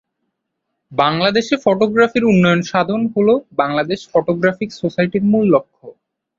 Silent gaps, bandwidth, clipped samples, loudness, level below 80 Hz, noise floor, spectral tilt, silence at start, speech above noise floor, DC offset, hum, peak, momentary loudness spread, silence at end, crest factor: none; 7.6 kHz; under 0.1%; -16 LUFS; -54 dBFS; -75 dBFS; -6.5 dB/octave; 0.9 s; 60 dB; under 0.1%; none; 0 dBFS; 6 LU; 0.45 s; 16 dB